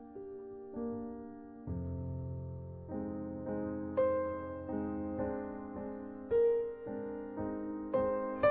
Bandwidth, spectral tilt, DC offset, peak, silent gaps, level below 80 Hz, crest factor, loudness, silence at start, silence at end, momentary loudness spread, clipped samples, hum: 4.5 kHz; -8 dB/octave; under 0.1%; -18 dBFS; none; -58 dBFS; 18 dB; -38 LUFS; 0 s; 0 s; 14 LU; under 0.1%; none